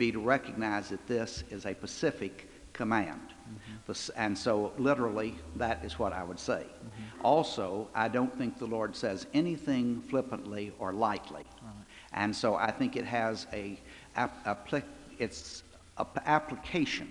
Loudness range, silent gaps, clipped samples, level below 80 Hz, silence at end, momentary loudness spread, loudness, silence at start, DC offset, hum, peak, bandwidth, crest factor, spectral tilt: 4 LU; none; under 0.1%; -58 dBFS; 0 s; 16 LU; -33 LUFS; 0 s; under 0.1%; none; -10 dBFS; 12 kHz; 22 dB; -5 dB/octave